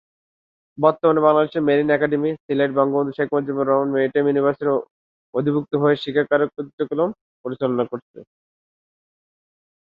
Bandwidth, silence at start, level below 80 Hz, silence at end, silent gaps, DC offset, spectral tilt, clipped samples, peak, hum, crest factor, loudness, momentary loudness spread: 5 kHz; 0.8 s; -66 dBFS; 1.55 s; 2.40-2.49 s, 4.91-5.33 s, 6.73-6.78 s, 7.21-7.44 s, 8.02-8.14 s; under 0.1%; -9.5 dB/octave; under 0.1%; -2 dBFS; none; 18 dB; -20 LUFS; 9 LU